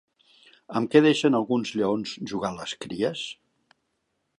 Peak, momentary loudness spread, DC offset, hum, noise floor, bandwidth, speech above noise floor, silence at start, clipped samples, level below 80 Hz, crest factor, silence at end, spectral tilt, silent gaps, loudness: -4 dBFS; 15 LU; under 0.1%; none; -76 dBFS; 11 kHz; 52 dB; 0.7 s; under 0.1%; -66 dBFS; 22 dB; 1.05 s; -5.5 dB/octave; none; -25 LUFS